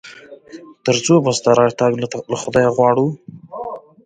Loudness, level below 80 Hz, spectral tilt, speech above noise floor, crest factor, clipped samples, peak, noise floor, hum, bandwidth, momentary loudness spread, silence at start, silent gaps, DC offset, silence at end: -16 LUFS; -54 dBFS; -5 dB/octave; 24 dB; 16 dB; under 0.1%; 0 dBFS; -39 dBFS; none; 9.4 kHz; 16 LU; 0.05 s; none; under 0.1%; 0.25 s